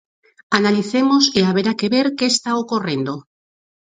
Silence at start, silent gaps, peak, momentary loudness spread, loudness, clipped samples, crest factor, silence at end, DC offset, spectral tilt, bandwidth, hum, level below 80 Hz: 0.5 s; none; 0 dBFS; 9 LU; -17 LUFS; under 0.1%; 18 dB; 0.75 s; under 0.1%; -4 dB/octave; 9.4 kHz; none; -60 dBFS